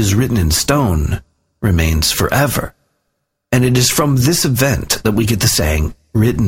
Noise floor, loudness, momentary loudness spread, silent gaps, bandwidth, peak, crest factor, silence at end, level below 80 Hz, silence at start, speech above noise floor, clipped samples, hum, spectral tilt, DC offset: -71 dBFS; -14 LUFS; 7 LU; none; 16.5 kHz; 0 dBFS; 14 dB; 0 s; -26 dBFS; 0 s; 57 dB; under 0.1%; none; -4.5 dB/octave; under 0.1%